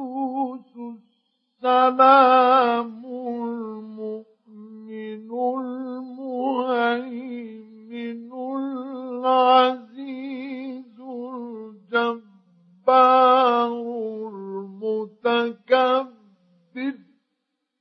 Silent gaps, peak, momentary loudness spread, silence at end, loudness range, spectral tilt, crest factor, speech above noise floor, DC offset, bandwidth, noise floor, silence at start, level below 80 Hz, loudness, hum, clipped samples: none; -2 dBFS; 21 LU; 0.85 s; 9 LU; -6.5 dB/octave; 22 dB; 62 dB; under 0.1%; 5.8 kHz; -78 dBFS; 0 s; -86 dBFS; -21 LUFS; none; under 0.1%